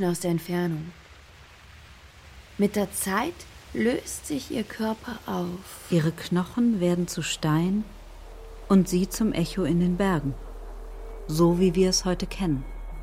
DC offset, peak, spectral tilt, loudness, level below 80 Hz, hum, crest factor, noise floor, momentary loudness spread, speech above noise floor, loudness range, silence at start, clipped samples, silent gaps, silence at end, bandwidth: under 0.1%; -10 dBFS; -5.5 dB/octave; -26 LUFS; -42 dBFS; none; 18 dB; -50 dBFS; 20 LU; 25 dB; 5 LU; 0 s; under 0.1%; none; 0 s; 16 kHz